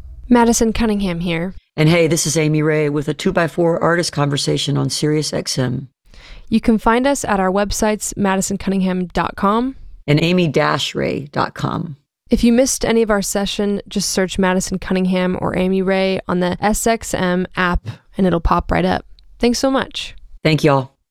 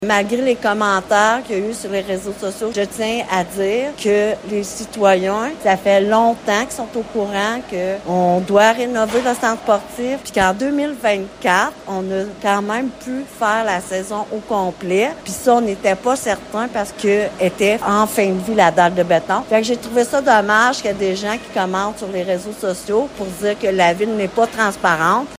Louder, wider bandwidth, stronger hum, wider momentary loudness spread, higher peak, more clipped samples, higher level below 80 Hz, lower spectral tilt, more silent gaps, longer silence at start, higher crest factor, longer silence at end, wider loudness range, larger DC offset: about the same, -17 LUFS vs -17 LUFS; about the same, 16 kHz vs 16 kHz; neither; about the same, 7 LU vs 9 LU; about the same, -2 dBFS vs 0 dBFS; neither; first, -34 dBFS vs -50 dBFS; about the same, -5 dB/octave vs -4 dB/octave; neither; about the same, 0 s vs 0 s; about the same, 16 dB vs 16 dB; first, 0.25 s vs 0 s; about the same, 2 LU vs 4 LU; neither